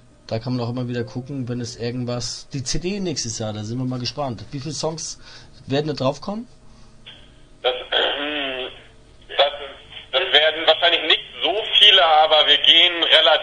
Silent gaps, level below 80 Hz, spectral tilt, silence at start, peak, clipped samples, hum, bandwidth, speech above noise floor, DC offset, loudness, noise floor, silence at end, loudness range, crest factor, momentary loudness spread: none; -46 dBFS; -3 dB/octave; 0.3 s; 0 dBFS; under 0.1%; none; 10.5 kHz; 25 dB; under 0.1%; -18 LUFS; -46 dBFS; 0 s; 13 LU; 20 dB; 18 LU